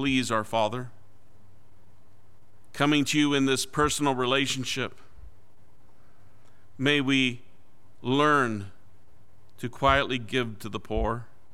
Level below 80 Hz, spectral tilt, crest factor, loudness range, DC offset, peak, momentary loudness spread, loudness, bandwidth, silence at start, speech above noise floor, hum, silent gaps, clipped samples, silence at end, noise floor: -46 dBFS; -4 dB/octave; 22 dB; 4 LU; 1%; -6 dBFS; 15 LU; -26 LUFS; 16 kHz; 0 s; 35 dB; none; none; under 0.1%; 0.3 s; -61 dBFS